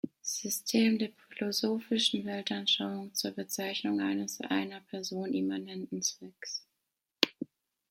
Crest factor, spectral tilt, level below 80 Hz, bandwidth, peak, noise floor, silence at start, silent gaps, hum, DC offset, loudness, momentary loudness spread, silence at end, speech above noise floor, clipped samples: 32 dB; -3 dB/octave; -80 dBFS; 16.5 kHz; -2 dBFS; -85 dBFS; 0.05 s; none; none; under 0.1%; -32 LUFS; 11 LU; 0.45 s; 52 dB; under 0.1%